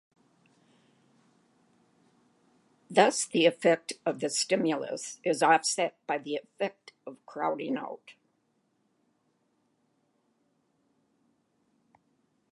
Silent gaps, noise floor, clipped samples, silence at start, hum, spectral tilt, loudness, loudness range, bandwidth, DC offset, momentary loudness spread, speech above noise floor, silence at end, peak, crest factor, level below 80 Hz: none; -74 dBFS; under 0.1%; 2.9 s; none; -3 dB/octave; -28 LUFS; 13 LU; 11.5 kHz; under 0.1%; 17 LU; 46 dB; 4.4 s; -8 dBFS; 24 dB; -88 dBFS